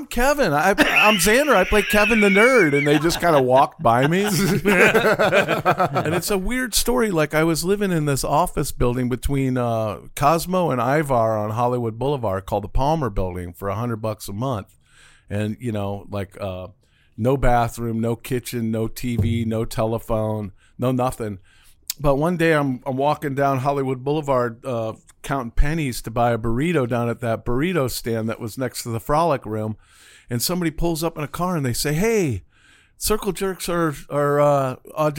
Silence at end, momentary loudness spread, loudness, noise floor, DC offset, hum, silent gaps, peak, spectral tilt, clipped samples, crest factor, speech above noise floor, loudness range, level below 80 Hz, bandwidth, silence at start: 0 s; 12 LU; -20 LUFS; -54 dBFS; under 0.1%; none; none; 0 dBFS; -5 dB/octave; under 0.1%; 20 dB; 34 dB; 9 LU; -34 dBFS; 17 kHz; 0 s